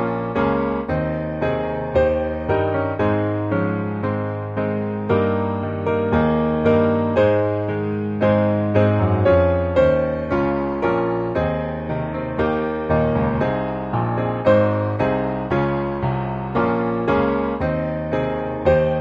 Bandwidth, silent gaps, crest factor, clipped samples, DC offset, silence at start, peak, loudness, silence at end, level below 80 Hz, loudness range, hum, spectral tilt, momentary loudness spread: 6.6 kHz; none; 16 dB; under 0.1%; under 0.1%; 0 s; -4 dBFS; -20 LUFS; 0 s; -38 dBFS; 3 LU; none; -9.5 dB/octave; 7 LU